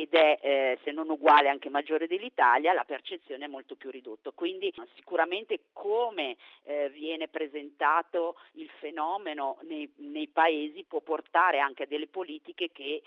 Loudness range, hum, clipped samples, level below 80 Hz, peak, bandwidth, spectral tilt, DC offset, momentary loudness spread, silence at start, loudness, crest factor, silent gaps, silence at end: 7 LU; none; under 0.1%; -88 dBFS; -8 dBFS; 6.2 kHz; 2 dB/octave; under 0.1%; 17 LU; 0 s; -29 LUFS; 20 dB; none; 0.05 s